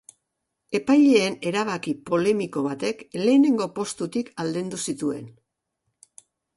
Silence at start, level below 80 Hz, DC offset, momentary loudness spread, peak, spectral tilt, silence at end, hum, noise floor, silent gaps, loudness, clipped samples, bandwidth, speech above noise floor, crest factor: 0.7 s; -68 dBFS; under 0.1%; 11 LU; -8 dBFS; -5 dB/octave; 1.25 s; none; -80 dBFS; none; -23 LUFS; under 0.1%; 11.5 kHz; 58 dB; 16 dB